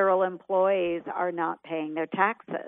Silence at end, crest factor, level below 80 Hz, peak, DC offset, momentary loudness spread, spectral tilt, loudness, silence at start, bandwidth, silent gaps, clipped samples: 0 s; 20 dB; -74 dBFS; -8 dBFS; under 0.1%; 7 LU; -9 dB/octave; -27 LUFS; 0 s; 3.8 kHz; none; under 0.1%